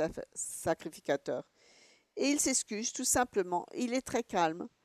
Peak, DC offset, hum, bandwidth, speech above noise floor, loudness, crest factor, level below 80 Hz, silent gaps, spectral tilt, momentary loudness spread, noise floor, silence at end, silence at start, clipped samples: -16 dBFS; under 0.1%; none; 13.5 kHz; 30 dB; -33 LUFS; 18 dB; -64 dBFS; none; -2.5 dB/octave; 10 LU; -64 dBFS; 0.15 s; 0 s; under 0.1%